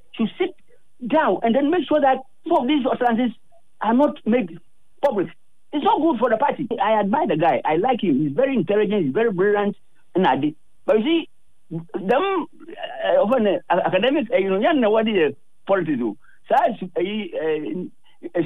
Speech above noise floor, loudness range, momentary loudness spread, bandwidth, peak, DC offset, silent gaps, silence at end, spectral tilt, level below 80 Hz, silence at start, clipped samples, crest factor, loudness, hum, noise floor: 21 dB; 3 LU; 11 LU; 10 kHz; -8 dBFS; 0.8%; none; 0 s; -8 dB/octave; -68 dBFS; 0.15 s; under 0.1%; 12 dB; -21 LUFS; none; -41 dBFS